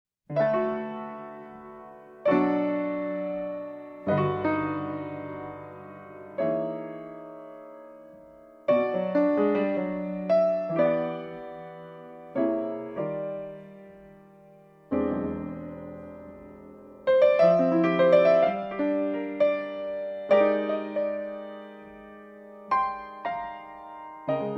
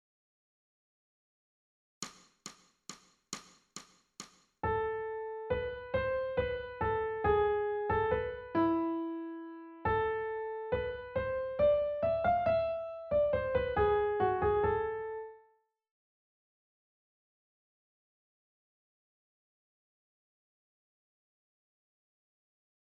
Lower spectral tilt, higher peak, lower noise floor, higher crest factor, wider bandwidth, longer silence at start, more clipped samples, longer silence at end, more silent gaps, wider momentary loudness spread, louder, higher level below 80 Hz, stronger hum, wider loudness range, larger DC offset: first, -9 dB/octave vs -6 dB/octave; first, -8 dBFS vs -18 dBFS; second, -54 dBFS vs -71 dBFS; about the same, 20 dB vs 18 dB; second, 5.8 kHz vs 11 kHz; second, 0.3 s vs 2 s; neither; second, 0 s vs 7.55 s; neither; about the same, 23 LU vs 21 LU; first, -26 LUFS vs -33 LUFS; second, -64 dBFS vs -54 dBFS; neither; second, 11 LU vs 18 LU; neither